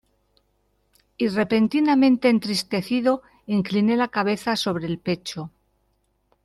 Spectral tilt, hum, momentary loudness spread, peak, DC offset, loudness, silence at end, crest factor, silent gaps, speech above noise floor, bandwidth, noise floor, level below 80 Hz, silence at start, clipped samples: -5.5 dB/octave; none; 10 LU; -6 dBFS; under 0.1%; -22 LUFS; 0.95 s; 16 dB; none; 47 dB; 13 kHz; -68 dBFS; -62 dBFS; 1.2 s; under 0.1%